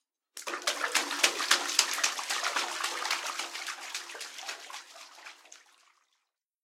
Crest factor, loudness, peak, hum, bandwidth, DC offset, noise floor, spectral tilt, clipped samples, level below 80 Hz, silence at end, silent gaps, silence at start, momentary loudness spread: 32 dB; -30 LUFS; -2 dBFS; none; 16.5 kHz; under 0.1%; -81 dBFS; 3 dB/octave; under 0.1%; under -90 dBFS; 1.05 s; none; 0.35 s; 21 LU